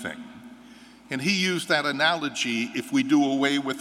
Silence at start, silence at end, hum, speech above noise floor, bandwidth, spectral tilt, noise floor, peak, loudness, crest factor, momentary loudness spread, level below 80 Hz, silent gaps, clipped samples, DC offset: 0 s; 0 s; none; 24 dB; 14.5 kHz; -3.5 dB/octave; -49 dBFS; -6 dBFS; -24 LUFS; 20 dB; 13 LU; -70 dBFS; none; under 0.1%; under 0.1%